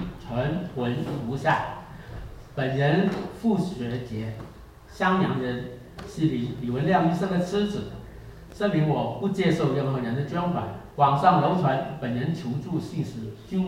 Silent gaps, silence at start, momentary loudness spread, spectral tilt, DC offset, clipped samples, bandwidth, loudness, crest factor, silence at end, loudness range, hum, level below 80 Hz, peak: none; 0 s; 17 LU; -7.5 dB/octave; under 0.1%; under 0.1%; 15 kHz; -26 LUFS; 20 dB; 0 s; 4 LU; none; -50 dBFS; -6 dBFS